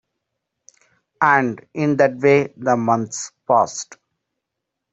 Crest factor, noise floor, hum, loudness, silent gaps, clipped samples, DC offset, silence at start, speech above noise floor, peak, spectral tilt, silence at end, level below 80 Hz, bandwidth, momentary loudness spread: 20 dB; -81 dBFS; none; -18 LUFS; none; under 0.1%; under 0.1%; 1.2 s; 63 dB; 0 dBFS; -5.5 dB/octave; 1 s; -64 dBFS; 8.2 kHz; 12 LU